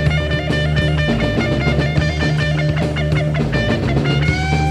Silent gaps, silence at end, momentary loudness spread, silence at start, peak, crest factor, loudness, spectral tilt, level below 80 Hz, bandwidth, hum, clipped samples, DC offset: none; 0 s; 1 LU; 0 s; -2 dBFS; 14 dB; -17 LUFS; -6.5 dB/octave; -26 dBFS; 10.5 kHz; none; under 0.1%; under 0.1%